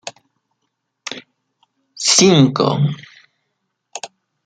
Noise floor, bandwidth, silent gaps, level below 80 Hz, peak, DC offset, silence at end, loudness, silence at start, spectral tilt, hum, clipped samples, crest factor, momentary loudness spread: -73 dBFS; 9.6 kHz; none; -60 dBFS; 0 dBFS; under 0.1%; 0.4 s; -13 LUFS; 0.05 s; -4 dB/octave; none; under 0.1%; 20 dB; 24 LU